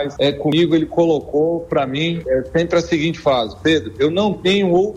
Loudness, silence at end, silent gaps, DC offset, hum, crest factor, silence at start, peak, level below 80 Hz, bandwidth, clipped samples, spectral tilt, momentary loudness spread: -17 LUFS; 0 s; none; under 0.1%; none; 12 dB; 0 s; -6 dBFS; -44 dBFS; 9.6 kHz; under 0.1%; -6 dB/octave; 4 LU